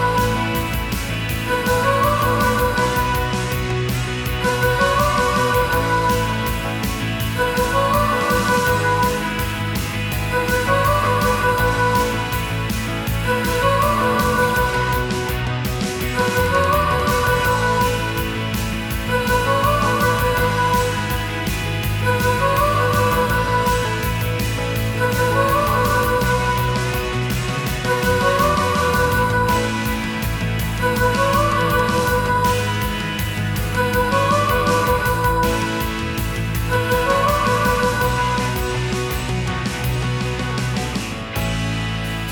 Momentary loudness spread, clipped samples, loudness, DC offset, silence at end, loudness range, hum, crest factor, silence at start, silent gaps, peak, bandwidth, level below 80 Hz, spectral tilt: 6 LU; under 0.1%; -19 LUFS; under 0.1%; 0 s; 0 LU; none; 16 dB; 0 s; none; -2 dBFS; 19.5 kHz; -30 dBFS; -5 dB/octave